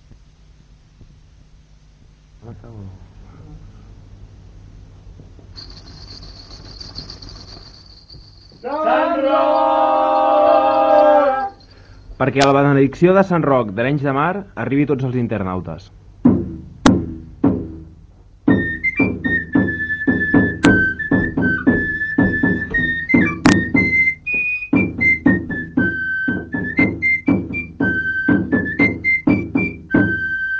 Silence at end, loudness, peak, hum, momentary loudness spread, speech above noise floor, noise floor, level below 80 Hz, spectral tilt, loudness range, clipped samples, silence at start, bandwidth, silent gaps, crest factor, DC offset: 0 s; -16 LUFS; 0 dBFS; none; 20 LU; 30 dB; -47 dBFS; -38 dBFS; -6.5 dB/octave; 9 LU; under 0.1%; 1 s; 8 kHz; none; 18 dB; under 0.1%